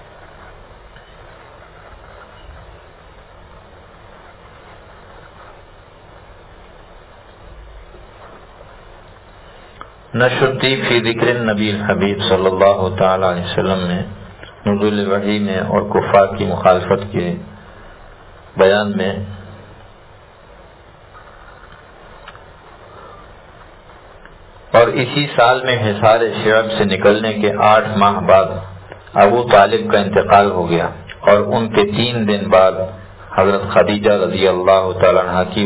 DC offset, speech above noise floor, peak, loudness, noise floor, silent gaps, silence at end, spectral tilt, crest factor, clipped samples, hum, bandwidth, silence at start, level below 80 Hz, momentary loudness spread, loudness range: under 0.1%; 29 dB; 0 dBFS; -14 LUFS; -42 dBFS; none; 0 s; -10 dB/octave; 16 dB; under 0.1%; none; 4 kHz; 0.2 s; -42 dBFS; 11 LU; 8 LU